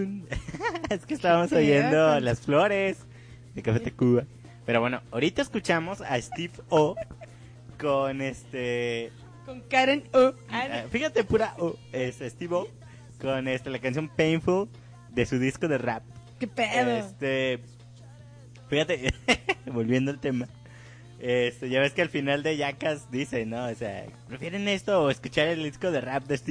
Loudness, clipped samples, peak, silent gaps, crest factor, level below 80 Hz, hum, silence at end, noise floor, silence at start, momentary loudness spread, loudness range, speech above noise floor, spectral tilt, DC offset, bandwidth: -27 LUFS; under 0.1%; -10 dBFS; none; 18 dB; -52 dBFS; 60 Hz at -50 dBFS; 0 s; -48 dBFS; 0 s; 13 LU; 5 LU; 21 dB; -5.5 dB/octave; under 0.1%; 10.5 kHz